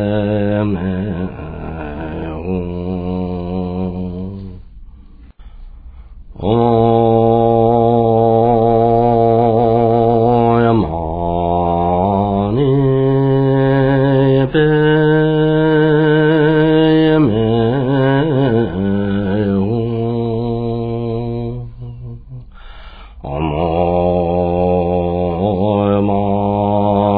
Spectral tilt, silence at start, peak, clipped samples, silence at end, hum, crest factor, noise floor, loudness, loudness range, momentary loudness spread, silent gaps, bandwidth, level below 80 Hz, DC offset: -11.5 dB/octave; 0 s; -2 dBFS; under 0.1%; 0 s; none; 12 dB; -38 dBFS; -14 LUFS; 11 LU; 12 LU; none; 4.9 kHz; -34 dBFS; under 0.1%